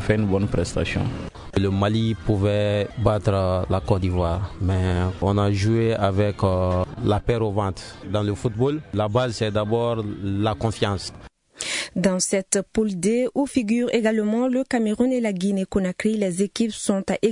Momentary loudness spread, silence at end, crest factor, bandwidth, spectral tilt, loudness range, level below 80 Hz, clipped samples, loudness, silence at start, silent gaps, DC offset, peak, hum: 5 LU; 0 s; 16 dB; 11 kHz; -6 dB/octave; 2 LU; -42 dBFS; under 0.1%; -23 LUFS; 0 s; none; under 0.1%; -6 dBFS; none